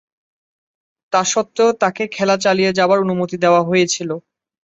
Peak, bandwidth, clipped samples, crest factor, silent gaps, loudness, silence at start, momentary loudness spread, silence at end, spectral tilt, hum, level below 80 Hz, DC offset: -2 dBFS; 8.2 kHz; under 0.1%; 16 dB; none; -16 LUFS; 1.1 s; 6 LU; 0.5 s; -4 dB/octave; none; -62 dBFS; under 0.1%